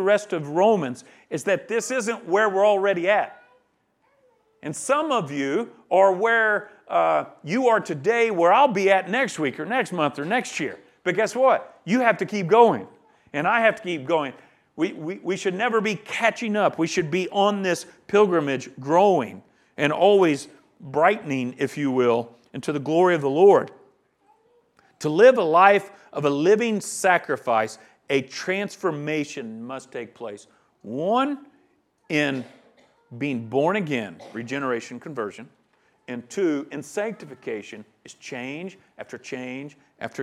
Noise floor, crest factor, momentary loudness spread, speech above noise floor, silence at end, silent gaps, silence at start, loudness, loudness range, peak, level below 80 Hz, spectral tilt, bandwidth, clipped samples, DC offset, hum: -67 dBFS; 22 dB; 17 LU; 45 dB; 0 s; none; 0 s; -22 LUFS; 9 LU; 0 dBFS; -76 dBFS; -5 dB/octave; 13.5 kHz; under 0.1%; under 0.1%; none